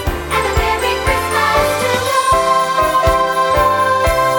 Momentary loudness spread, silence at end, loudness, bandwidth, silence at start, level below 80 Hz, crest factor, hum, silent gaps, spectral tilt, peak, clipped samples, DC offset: 3 LU; 0 s; -14 LUFS; 19 kHz; 0 s; -26 dBFS; 14 dB; none; none; -3.5 dB/octave; 0 dBFS; under 0.1%; under 0.1%